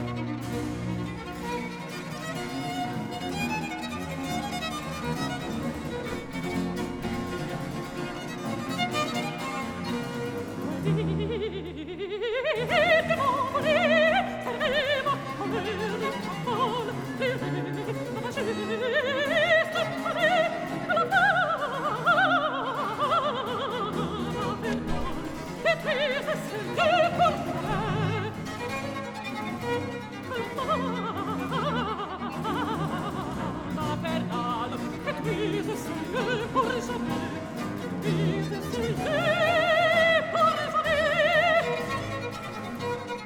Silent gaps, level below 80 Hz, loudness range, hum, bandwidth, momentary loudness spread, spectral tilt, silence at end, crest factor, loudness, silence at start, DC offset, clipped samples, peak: none; -52 dBFS; 8 LU; none; 19 kHz; 12 LU; -5 dB/octave; 0 s; 18 dB; -28 LUFS; 0 s; under 0.1%; under 0.1%; -10 dBFS